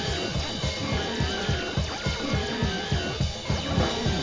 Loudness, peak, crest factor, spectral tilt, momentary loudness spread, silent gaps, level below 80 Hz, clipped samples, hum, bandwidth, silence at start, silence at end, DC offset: -27 LUFS; -10 dBFS; 16 dB; -4.5 dB/octave; 3 LU; none; -36 dBFS; under 0.1%; none; 7.6 kHz; 0 s; 0 s; 0.1%